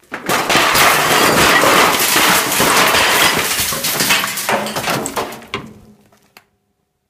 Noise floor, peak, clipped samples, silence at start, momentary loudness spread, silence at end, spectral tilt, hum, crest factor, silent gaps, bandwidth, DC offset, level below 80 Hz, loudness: -67 dBFS; 0 dBFS; under 0.1%; 0.1 s; 11 LU; 1.35 s; -1.5 dB/octave; none; 14 dB; none; 17.5 kHz; under 0.1%; -44 dBFS; -12 LUFS